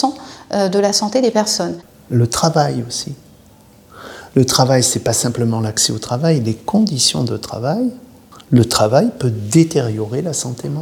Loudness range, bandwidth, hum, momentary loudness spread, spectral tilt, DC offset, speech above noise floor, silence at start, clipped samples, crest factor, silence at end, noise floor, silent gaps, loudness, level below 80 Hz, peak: 3 LU; 18.5 kHz; none; 10 LU; -4.5 dB/octave; under 0.1%; 30 dB; 0 s; under 0.1%; 16 dB; 0 s; -46 dBFS; none; -16 LUFS; -48 dBFS; 0 dBFS